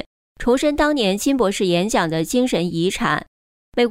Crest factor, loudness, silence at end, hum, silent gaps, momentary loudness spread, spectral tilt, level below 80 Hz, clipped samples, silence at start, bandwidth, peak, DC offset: 14 dB; -19 LUFS; 0 s; none; 3.27-3.72 s; 6 LU; -4.5 dB/octave; -42 dBFS; under 0.1%; 0.4 s; 16 kHz; -6 dBFS; under 0.1%